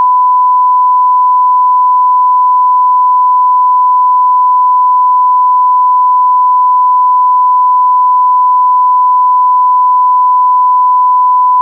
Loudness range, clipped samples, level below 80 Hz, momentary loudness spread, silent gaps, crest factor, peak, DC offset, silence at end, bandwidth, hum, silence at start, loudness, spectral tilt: 0 LU; under 0.1%; under -90 dBFS; 0 LU; none; 4 dB; -4 dBFS; under 0.1%; 0 s; 1.1 kHz; none; 0 s; -7 LUFS; -4 dB/octave